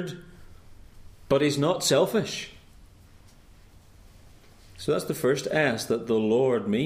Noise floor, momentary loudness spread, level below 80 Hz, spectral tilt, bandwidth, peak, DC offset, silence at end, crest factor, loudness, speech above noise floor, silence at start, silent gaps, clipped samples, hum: -52 dBFS; 13 LU; -54 dBFS; -4.5 dB/octave; 15.5 kHz; -10 dBFS; under 0.1%; 0 s; 18 dB; -25 LUFS; 28 dB; 0 s; none; under 0.1%; none